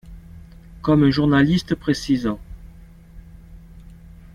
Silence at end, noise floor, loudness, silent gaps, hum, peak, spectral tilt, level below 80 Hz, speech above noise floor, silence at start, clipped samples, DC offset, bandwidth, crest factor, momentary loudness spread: 0.55 s; -43 dBFS; -19 LUFS; none; none; -4 dBFS; -7 dB/octave; -42 dBFS; 26 dB; 0.05 s; under 0.1%; under 0.1%; 12 kHz; 18 dB; 11 LU